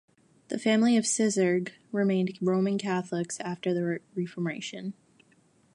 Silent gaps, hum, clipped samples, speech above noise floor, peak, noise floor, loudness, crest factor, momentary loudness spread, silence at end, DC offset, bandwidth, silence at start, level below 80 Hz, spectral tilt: none; none; under 0.1%; 36 dB; -12 dBFS; -64 dBFS; -28 LUFS; 16 dB; 12 LU; 0.85 s; under 0.1%; 11.5 kHz; 0.5 s; -78 dBFS; -5 dB/octave